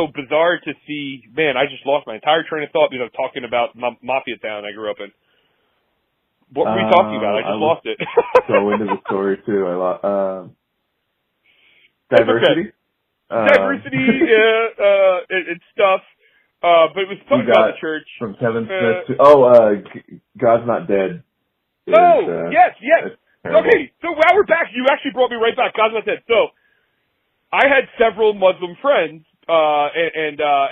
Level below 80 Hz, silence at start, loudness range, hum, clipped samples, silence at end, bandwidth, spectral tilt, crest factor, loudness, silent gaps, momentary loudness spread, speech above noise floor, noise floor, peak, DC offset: -58 dBFS; 0 s; 6 LU; none; under 0.1%; 0 s; 6.4 kHz; -6.5 dB/octave; 16 dB; -16 LUFS; none; 13 LU; 56 dB; -72 dBFS; 0 dBFS; under 0.1%